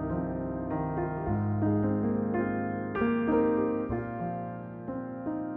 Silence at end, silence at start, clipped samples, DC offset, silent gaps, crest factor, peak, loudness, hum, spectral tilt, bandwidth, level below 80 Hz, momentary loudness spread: 0 s; 0 s; under 0.1%; under 0.1%; none; 16 dB; -14 dBFS; -31 LUFS; none; -9 dB/octave; 3.8 kHz; -50 dBFS; 11 LU